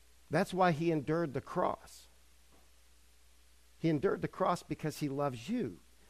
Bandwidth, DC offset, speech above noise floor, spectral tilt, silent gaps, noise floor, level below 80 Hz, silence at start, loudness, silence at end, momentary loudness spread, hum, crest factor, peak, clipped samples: 15 kHz; under 0.1%; 31 dB; -6.5 dB/octave; none; -65 dBFS; -64 dBFS; 0.3 s; -35 LUFS; 0.35 s; 8 LU; none; 18 dB; -18 dBFS; under 0.1%